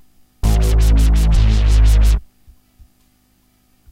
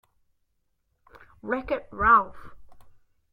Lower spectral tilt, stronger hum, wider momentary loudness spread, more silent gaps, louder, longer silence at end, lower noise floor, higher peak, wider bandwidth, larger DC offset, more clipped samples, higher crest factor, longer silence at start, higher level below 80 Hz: second, -6 dB/octave vs -7.5 dB/octave; first, 50 Hz at -35 dBFS vs none; second, 5 LU vs 18 LU; neither; first, -16 LUFS vs -23 LUFS; first, 1.7 s vs 0.5 s; second, -57 dBFS vs -73 dBFS; about the same, -4 dBFS vs -6 dBFS; first, 13 kHz vs 5.2 kHz; neither; neither; second, 12 dB vs 22 dB; second, 0.45 s vs 1.45 s; first, -14 dBFS vs -48 dBFS